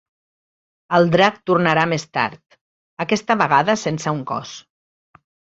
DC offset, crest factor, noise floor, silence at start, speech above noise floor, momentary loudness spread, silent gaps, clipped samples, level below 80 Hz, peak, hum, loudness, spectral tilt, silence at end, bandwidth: under 0.1%; 20 dB; under -90 dBFS; 0.9 s; over 72 dB; 12 LU; 2.61-2.97 s; under 0.1%; -60 dBFS; -2 dBFS; none; -18 LUFS; -5 dB/octave; 0.9 s; 8 kHz